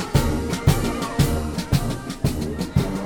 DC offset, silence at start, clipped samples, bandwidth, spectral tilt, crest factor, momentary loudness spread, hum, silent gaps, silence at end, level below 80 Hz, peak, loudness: under 0.1%; 0 s; under 0.1%; over 20 kHz; -6 dB/octave; 16 dB; 5 LU; none; none; 0 s; -30 dBFS; -4 dBFS; -23 LUFS